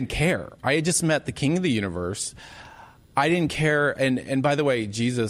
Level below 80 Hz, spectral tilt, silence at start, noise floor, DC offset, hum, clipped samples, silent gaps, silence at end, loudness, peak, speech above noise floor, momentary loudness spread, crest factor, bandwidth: -46 dBFS; -4.5 dB/octave; 0 s; -48 dBFS; under 0.1%; none; under 0.1%; none; 0 s; -24 LUFS; -8 dBFS; 24 dB; 8 LU; 16 dB; 14.5 kHz